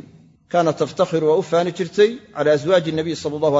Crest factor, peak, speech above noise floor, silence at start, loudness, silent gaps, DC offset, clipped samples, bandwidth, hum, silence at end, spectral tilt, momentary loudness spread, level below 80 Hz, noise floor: 16 dB; -4 dBFS; 29 dB; 0.5 s; -19 LUFS; none; under 0.1%; under 0.1%; 7.8 kHz; none; 0 s; -6 dB/octave; 6 LU; -60 dBFS; -47 dBFS